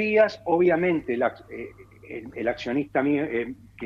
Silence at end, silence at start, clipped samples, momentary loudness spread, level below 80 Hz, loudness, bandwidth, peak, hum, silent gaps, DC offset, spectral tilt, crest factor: 0 s; 0 s; under 0.1%; 18 LU; -58 dBFS; -24 LUFS; 7 kHz; -8 dBFS; none; none; under 0.1%; -7.5 dB/octave; 18 dB